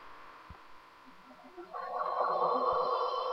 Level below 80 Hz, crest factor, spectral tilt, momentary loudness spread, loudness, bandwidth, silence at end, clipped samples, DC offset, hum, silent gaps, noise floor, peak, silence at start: -68 dBFS; 16 dB; -5 dB/octave; 23 LU; -32 LUFS; 7.6 kHz; 0 s; under 0.1%; under 0.1%; none; none; -56 dBFS; -18 dBFS; 0 s